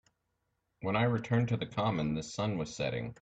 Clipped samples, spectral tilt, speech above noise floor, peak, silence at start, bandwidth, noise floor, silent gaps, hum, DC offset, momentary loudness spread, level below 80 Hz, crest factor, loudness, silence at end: under 0.1%; -6.5 dB/octave; 49 dB; -16 dBFS; 0.8 s; 8.2 kHz; -81 dBFS; none; none; under 0.1%; 5 LU; -60 dBFS; 18 dB; -33 LUFS; 0.1 s